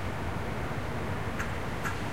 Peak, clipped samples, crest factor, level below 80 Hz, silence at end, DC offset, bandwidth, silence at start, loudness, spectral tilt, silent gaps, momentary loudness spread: -18 dBFS; under 0.1%; 16 dB; -44 dBFS; 0 s; 1%; 16 kHz; 0 s; -34 LUFS; -5.5 dB/octave; none; 1 LU